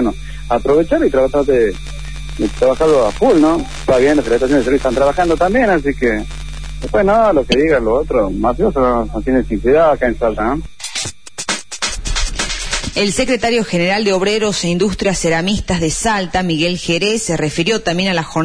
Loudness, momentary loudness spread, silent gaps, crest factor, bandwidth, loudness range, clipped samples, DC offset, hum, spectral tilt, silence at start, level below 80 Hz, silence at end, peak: -15 LUFS; 9 LU; none; 14 dB; 11 kHz; 4 LU; under 0.1%; 3%; none; -4.5 dB/octave; 0 s; -28 dBFS; 0 s; 0 dBFS